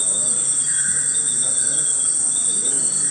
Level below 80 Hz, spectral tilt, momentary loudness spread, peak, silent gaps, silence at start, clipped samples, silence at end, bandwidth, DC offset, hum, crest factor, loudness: -62 dBFS; 0.5 dB/octave; 0 LU; -6 dBFS; none; 0 s; under 0.1%; 0 s; 16 kHz; under 0.1%; none; 12 dB; -16 LUFS